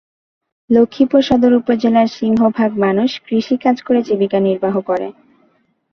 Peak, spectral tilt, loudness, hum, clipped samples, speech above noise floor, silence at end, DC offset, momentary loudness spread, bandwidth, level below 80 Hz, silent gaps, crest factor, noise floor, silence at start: -2 dBFS; -7 dB/octave; -15 LUFS; none; under 0.1%; 45 dB; 0.8 s; under 0.1%; 6 LU; 6.4 kHz; -52 dBFS; none; 14 dB; -59 dBFS; 0.7 s